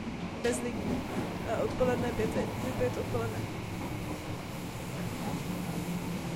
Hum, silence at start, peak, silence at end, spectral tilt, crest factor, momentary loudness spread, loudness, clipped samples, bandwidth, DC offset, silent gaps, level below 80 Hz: none; 0 s; -16 dBFS; 0 s; -6 dB/octave; 18 dB; 8 LU; -34 LUFS; under 0.1%; 16.5 kHz; under 0.1%; none; -50 dBFS